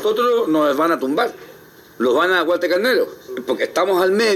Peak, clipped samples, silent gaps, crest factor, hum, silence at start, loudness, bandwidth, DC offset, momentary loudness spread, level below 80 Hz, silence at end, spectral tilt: -4 dBFS; under 0.1%; none; 14 dB; none; 0 s; -18 LUFS; 16 kHz; under 0.1%; 7 LU; -64 dBFS; 0 s; -4 dB/octave